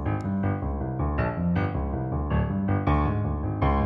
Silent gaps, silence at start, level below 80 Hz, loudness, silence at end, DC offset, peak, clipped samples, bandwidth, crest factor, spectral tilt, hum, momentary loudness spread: none; 0 s; -32 dBFS; -27 LUFS; 0 s; under 0.1%; -10 dBFS; under 0.1%; 4.9 kHz; 14 dB; -10.5 dB/octave; none; 5 LU